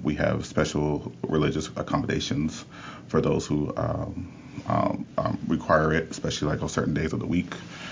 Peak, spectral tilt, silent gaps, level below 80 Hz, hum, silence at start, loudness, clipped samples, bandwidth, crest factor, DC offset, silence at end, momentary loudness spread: -8 dBFS; -6 dB/octave; none; -44 dBFS; none; 0 s; -27 LUFS; under 0.1%; 7.6 kHz; 20 dB; under 0.1%; 0 s; 11 LU